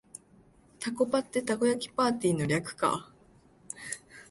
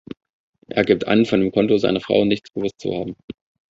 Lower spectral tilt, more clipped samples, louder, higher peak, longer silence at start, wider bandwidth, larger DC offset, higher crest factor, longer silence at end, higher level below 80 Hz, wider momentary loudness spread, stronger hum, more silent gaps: second, -5 dB/octave vs -7 dB/octave; neither; second, -30 LUFS vs -19 LUFS; second, -14 dBFS vs -2 dBFS; about the same, 0.8 s vs 0.7 s; first, 12 kHz vs 7.8 kHz; neither; about the same, 18 dB vs 18 dB; second, 0.1 s vs 0.4 s; second, -64 dBFS vs -52 dBFS; second, 14 LU vs 22 LU; neither; second, none vs 3.24-3.28 s